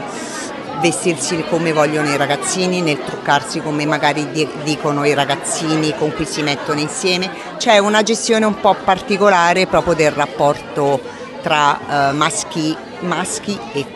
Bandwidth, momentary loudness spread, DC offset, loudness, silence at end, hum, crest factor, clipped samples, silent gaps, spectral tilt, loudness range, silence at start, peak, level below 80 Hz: 12.5 kHz; 9 LU; under 0.1%; -16 LUFS; 0 s; none; 16 dB; under 0.1%; none; -4 dB/octave; 4 LU; 0 s; 0 dBFS; -50 dBFS